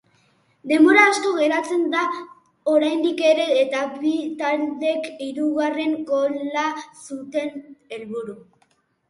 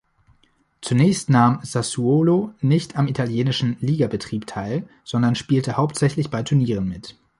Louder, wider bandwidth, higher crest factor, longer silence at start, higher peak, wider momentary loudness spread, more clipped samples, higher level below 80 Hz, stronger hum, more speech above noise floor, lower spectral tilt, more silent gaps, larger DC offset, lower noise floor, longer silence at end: about the same, -20 LUFS vs -21 LUFS; about the same, 11.5 kHz vs 11.5 kHz; about the same, 22 dB vs 18 dB; second, 0.65 s vs 0.8 s; about the same, 0 dBFS vs -2 dBFS; first, 17 LU vs 11 LU; neither; second, -74 dBFS vs -52 dBFS; neither; about the same, 44 dB vs 42 dB; second, -3 dB/octave vs -6.5 dB/octave; neither; neither; about the same, -64 dBFS vs -62 dBFS; first, 0.7 s vs 0.3 s